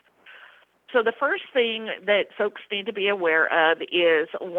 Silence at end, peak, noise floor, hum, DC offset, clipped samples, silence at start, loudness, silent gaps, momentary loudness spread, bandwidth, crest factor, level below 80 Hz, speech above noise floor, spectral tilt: 0 s; -6 dBFS; -53 dBFS; 60 Hz at -70 dBFS; under 0.1%; under 0.1%; 0.25 s; -23 LUFS; none; 8 LU; 4.1 kHz; 18 dB; -78 dBFS; 29 dB; -5.5 dB/octave